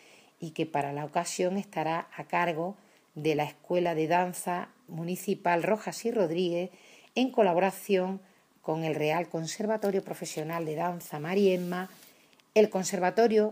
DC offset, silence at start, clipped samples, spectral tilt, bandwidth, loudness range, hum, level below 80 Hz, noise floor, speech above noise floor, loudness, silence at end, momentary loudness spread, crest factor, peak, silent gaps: under 0.1%; 0.4 s; under 0.1%; -5 dB/octave; 15.5 kHz; 3 LU; none; -80 dBFS; -60 dBFS; 31 dB; -30 LUFS; 0 s; 11 LU; 20 dB; -10 dBFS; none